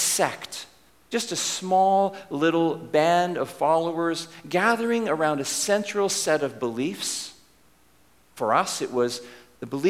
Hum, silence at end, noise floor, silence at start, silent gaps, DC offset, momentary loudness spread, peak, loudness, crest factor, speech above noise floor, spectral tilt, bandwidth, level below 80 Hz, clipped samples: none; 0 s; -60 dBFS; 0 s; none; under 0.1%; 11 LU; -6 dBFS; -24 LUFS; 20 dB; 36 dB; -3 dB/octave; 16 kHz; -68 dBFS; under 0.1%